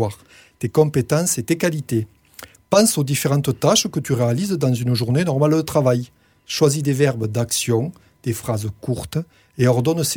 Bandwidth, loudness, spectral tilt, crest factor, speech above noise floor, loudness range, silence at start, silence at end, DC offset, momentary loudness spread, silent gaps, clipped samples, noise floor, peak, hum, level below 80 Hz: 19 kHz; -20 LUFS; -5 dB/octave; 16 dB; 24 dB; 3 LU; 0 s; 0 s; under 0.1%; 11 LU; none; under 0.1%; -43 dBFS; -2 dBFS; none; -52 dBFS